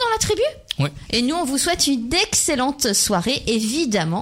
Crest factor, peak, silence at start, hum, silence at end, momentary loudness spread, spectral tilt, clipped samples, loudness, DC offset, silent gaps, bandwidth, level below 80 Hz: 14 dB; -6 dBFS; 0 s; none; 0 s; 5 LU; -3 dB/octave; under 0.1%; -19 LUFS; under 0.1%; none; 16 kHz; -42 dBFS